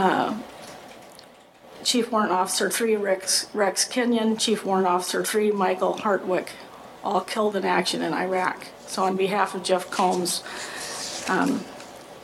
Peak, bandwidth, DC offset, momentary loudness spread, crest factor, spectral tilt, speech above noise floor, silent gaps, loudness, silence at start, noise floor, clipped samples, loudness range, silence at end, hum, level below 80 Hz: -6 dBFS; 16.5 kHz; under 0.1%; 15 LU; 18 dB; -3 dB/octave; 26 dB; none; -24 LUFS; 0 s; -49 dBFS; under 0.1%; 3 LU; 0 s; none; -68 dBFS